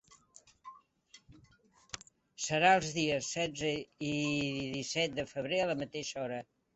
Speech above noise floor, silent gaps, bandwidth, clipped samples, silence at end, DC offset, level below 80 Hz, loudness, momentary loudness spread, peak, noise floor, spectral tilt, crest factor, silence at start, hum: 32 dB; none; 8.2 kHz; under 0.1%; 0.35 s; under 0.1%; -66 dBFS; -33 LUFS; 19 LU; -12 dBFS; -66 dBFS; -3.5 dB/octave; 22 dB; 0.1 s; none